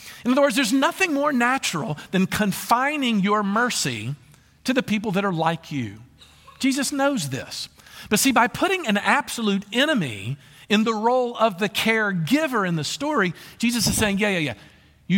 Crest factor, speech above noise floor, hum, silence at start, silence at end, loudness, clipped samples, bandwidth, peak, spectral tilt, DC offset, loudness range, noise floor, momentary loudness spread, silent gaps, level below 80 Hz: 18 dB; 28 dB; none; 0 s; 0 s; -22 LUFS; under 0.1%; 17 kHz; -4 dBFS; -4 dB/octave; under 0.1%; 4 LU; -50 dBFS; 11 LU; none; -52 dBFS